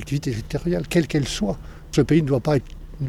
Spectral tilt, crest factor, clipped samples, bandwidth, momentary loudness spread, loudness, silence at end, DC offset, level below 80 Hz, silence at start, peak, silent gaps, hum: -6.5 dB/octave; 16 dB; under 0.1%; 15 kHz; 8 LU; -22 LUFS; 0 s; under 0.1%; -38 dBFS; 0 s; -6 dBFS; none; none